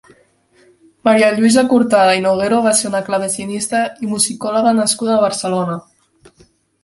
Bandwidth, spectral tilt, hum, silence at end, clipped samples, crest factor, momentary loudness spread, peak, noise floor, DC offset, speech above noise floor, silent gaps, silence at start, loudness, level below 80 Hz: 12 kHz; -3.5 dB/octave; none; 1.05 s; under 0.1%; 16 dB; 9 LU; 0 dBFS; -53 dBFS; under 0.1%; 39 dB; none; 1.05 s; -15 LUFS; -58 dBFS